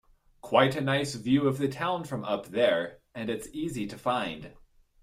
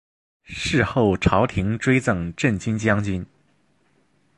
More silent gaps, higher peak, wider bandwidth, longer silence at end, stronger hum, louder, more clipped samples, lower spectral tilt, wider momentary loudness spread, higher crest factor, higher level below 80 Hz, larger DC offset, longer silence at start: neither; second, -8 dBFS vs -2 dBFS; first, 15.5 kHz vs 11.5 kHz; second, 0.5 s vs 1.1 s; neither; second, -29 LUFS vs -21 LUFS; neither; about the same, -5.5 dB/octave vs -6 dB/octave; about the same, 11 LU vs 9 LU; about the same, 20 dB vs 20 dB; second, -60 dBFS vs -40 dBFS; neither; about the same, 0.45 s vs 0.5 s